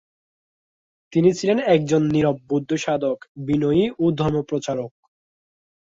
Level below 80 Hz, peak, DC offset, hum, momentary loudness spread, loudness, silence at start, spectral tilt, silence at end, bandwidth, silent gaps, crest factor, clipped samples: -54 dBFS; -4 dBFS; under 0.1%; none; 8 LU; -21 LUFS; 1.1 s; -6.5 dB/octave; 1.05 s; 7.8 kHz; 3.29-3.35 s; 18 dB; under 0.1%